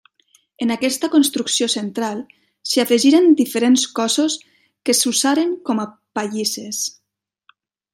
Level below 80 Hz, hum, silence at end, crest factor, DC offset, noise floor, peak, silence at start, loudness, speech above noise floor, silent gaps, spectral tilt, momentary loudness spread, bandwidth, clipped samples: -72 dBFS; none; 1.05 s; 16 dB; under 0.1%; -78 dBFS; -2 dBFS; 0.6 s; -18 LUFS; 61 dB; none; -2.5 dB/octave; 12 LU; 16 kHz; under 0.1%